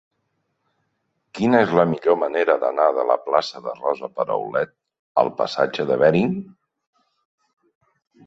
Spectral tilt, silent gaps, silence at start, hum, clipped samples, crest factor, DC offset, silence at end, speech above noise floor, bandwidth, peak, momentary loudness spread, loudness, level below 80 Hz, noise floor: -7 dB/octave; 4.99-5.15 s; 1.35 s; none; under 0.1%; 20 dB; under 0.1%; 1.85 s; 53 dB; 8 kHz; -2 dBFS; 9 LU; -21 LUFS; -62 dBFS; -73 dBFS